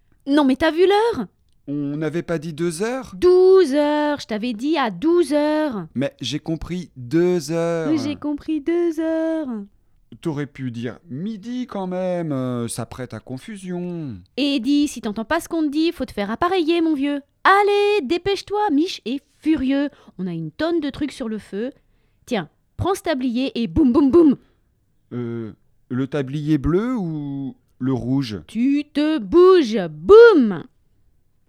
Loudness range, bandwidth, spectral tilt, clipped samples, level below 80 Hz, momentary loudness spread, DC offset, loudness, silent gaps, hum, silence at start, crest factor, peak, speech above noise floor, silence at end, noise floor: 8 LU; 13.5 kHz; -6 dB/octave; under 0.1%; -46 dBFS; 15 LU; under 0.1%; -20 LUFS; none; none; 0.25 s; 20 dB; 0 dBFS; 43 dB; 0.85 s; -62 dBFS